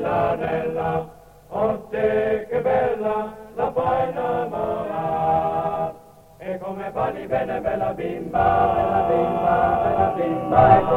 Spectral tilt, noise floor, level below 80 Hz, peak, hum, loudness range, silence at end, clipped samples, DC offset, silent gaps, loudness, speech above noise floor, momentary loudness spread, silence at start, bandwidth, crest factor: -8 dB/octave; -46 dBFS; -44 dBFS; -2 dBFS; none; 4 LU; 0 s; under 0.1%; under 0.1%; none; -22 LUFS; 26 dB; 10 LU; 0 s; 15.5 kHz; 20 dB